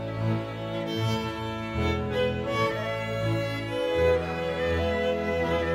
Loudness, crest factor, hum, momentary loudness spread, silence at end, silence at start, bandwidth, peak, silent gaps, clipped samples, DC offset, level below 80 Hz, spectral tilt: -28 LUFS; 16 dB; none; 6 LU; 0 s; 0 s; 16 kHz; -12 dBFS; none; under 0.1%; under 0.1%; -42 dBFS; -6.5 dB/octave